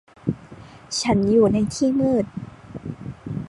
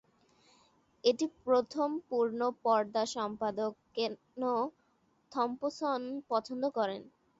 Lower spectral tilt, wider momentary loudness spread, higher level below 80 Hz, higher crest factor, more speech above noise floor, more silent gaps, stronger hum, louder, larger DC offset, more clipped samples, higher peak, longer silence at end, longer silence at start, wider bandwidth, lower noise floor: first, -6 dB/octave vs -4.5 dB/octave; first, 19 LU vs 7 LU; first, -48 dBFS vs -76 dBFS; about the same, 16 dB vs 20 dB; second, 24 dB vs 39 dB; neither; neither; first, -21 LUFS vs -34 LUFS; neither; neither; first, -6 dBFS vs -14 dBFS; second, 0 s vs 0.3 s; second, 0.25 s vs 1.05 s; first, 11.5 kHz vs 8 kHz; second, -43 dBFS vs -72 dBFS